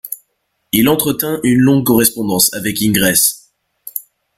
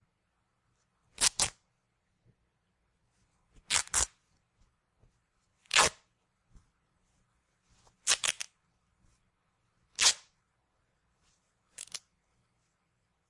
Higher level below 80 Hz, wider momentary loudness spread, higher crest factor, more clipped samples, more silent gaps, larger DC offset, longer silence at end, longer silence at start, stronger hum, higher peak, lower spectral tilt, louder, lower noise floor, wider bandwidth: first, -46 dBFS vs -60 dBFS; second, 15 LU vs 18 LU; second, 16 dB vs 34 dB; neither; neither; neither; second, 0.35 s vs 1.3 s; second, 0.05 s vs 1.2 s; neither; first, 0 dBFS vs -4 dBFS; first, -3.5 dB/octave vs 1 dB/octave; first, -13 LUFS vs -28 LUFS; second, -67 dBFS vs -78 dBFS; first, 17 kHz vs 11.5 kHz